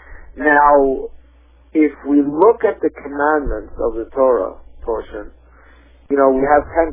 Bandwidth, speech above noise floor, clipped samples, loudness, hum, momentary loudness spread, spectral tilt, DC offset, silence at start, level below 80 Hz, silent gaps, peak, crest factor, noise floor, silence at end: 3.7 kHz; 32 dB; under 0.1%; -16 LUFS; none; 14 LU; -10.5 dB/octave; under 0.1%; 0.1 s; -38 dBFS; none; 0 dBFS; 16 dB; -48 dBFS; 0 s